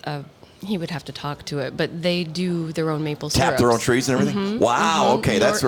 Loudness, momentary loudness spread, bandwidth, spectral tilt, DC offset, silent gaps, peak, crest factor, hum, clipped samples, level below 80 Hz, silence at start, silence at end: -21 LUFS; 12 LU; 19.5 kHz; -5 dB/octave; under 0.1%; none; -6 dBFS; 16 dB; none; under 0.1%; -48 dBFS; 0.05 s; 0 s